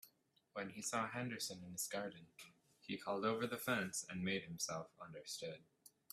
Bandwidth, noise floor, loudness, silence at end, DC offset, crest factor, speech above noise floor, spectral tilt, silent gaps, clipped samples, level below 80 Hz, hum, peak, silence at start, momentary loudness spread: 15.5 kHz; -76 dBFS; -44 LUFS; 0.25 s; under 0.1%; 22 dB; 31 dB; -3.5 dB/octave; none; under 0.1%; -82 dBFS; none; -24 dBFS; 0.05 s; 17 LU